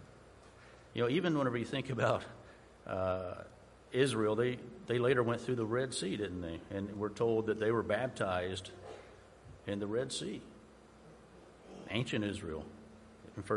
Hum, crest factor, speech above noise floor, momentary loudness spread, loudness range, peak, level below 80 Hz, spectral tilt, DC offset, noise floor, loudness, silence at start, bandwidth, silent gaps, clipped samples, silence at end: none; 20 dB; 23 dB; 20 LU; 8 LU; -16 dBFS; -64 dBFS; -5.5 dB/octave; under 0.1%; -58 dBFS; -36 LUFS; 0 s; 11.5 kHz; none; under 0.1%; 0 s